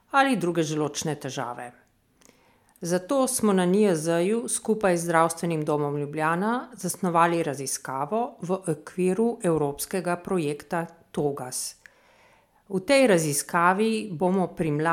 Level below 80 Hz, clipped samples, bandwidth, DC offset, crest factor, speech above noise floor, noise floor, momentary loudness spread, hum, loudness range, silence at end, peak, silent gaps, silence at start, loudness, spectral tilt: -64 dBFS; under 0.1%; 17 kHz; under 0.1%; 20 dB; 36 dB; -61 dBFS; 10 LU; none; 5 LU; 0 s; -4 dBFS; none; 0.15 s; -25 LUFS; -5 dB/octave